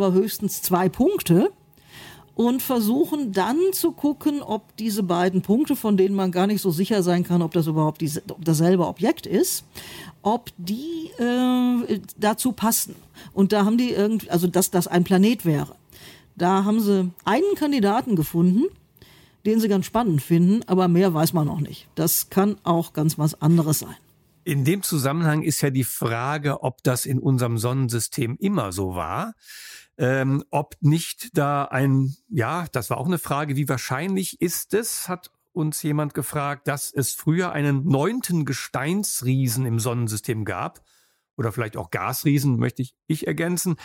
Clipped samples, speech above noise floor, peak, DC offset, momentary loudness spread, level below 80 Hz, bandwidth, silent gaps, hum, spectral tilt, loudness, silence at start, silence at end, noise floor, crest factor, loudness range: under 0.1%; 30 dB; -8 dBFS; under 0.1%; 9 LU; -58 dBFS; 17 kHz; 41.33-41.37 s; none; -5.5 dB/octave; -22 LUFS; 0 s; 0 s; -52 dBFS; 16 dB; 4 LU